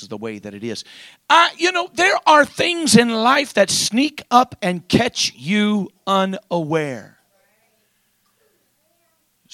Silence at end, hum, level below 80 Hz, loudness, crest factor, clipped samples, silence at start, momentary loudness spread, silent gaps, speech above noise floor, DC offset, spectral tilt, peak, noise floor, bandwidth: 2.5 s; none; -56 dBFS; -17 LUFS; 20 dB; under 0.1%; 0 s; 16 LU; none; 47 dB; under 0.1%; -3.5 dB/octave; 0 dBFS; -64 dBFS; 15 kHz